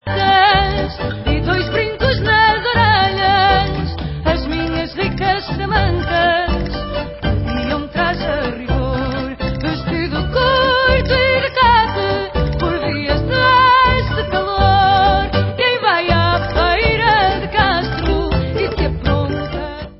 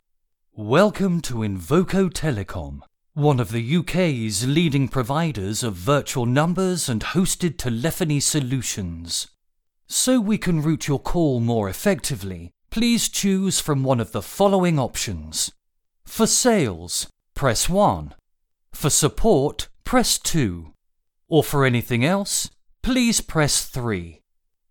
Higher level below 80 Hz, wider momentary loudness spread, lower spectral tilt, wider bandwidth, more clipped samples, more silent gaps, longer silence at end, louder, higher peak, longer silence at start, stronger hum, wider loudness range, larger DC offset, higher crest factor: first, -26 dBFS vs -40 dBFS; about the same, 9 LU vs 10 LU; first, -10 dB/octave vs -4.5 dB/octave; second, 5.8 kHz vs 19 kHz; neither; neither; second, 0 s vs 0.55 s; first, -15 LUFS vs -21 LUFS; first, 0 dBFS vs -4 dBFS; second, 0.05 s vs 0.55 s; neither; first, 5 LU vs 2 LU; neither; about the same, 16 dB vs 18 dB